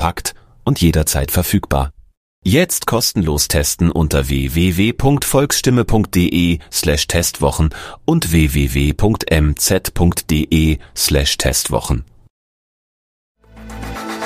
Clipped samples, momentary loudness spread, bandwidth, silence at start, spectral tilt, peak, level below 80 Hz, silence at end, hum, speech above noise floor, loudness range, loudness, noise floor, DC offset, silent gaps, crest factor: under 0.1%; 8 LU; 15.5 kHz; 0 s; -4.5 dB/octave; -2 dBFS; -24 dBFS; 0 s; none; over 75 dB; 3 LU; -16 LUFS; under -90 dBFS; under 0.1%; 2.17-2.42 s, 12.30-13.35 s; 14 dB